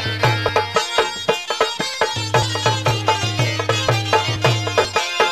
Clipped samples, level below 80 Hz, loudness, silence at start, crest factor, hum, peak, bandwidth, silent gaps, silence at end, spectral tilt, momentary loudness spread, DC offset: under 0.1%; -48 dBFS; -18 LUFS; 0 s; 18 dB; none; -2 dBFS; 13 kHz; none; 0 s; -3.5 dB/octave; 3 LU; 0.2%